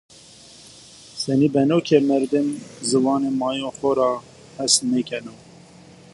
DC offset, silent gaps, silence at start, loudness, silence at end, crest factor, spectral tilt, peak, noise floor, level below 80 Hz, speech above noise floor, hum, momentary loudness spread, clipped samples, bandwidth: under 0.1%; none; 1.15 s; -21 LUFS; 0.8 s; 20 dB; -4.5 dB/octave; -2 dBFS; -46 dBFS; -62 dBFS; 26 dB; none; 12 LU; under 0.1%; 11.5 kHz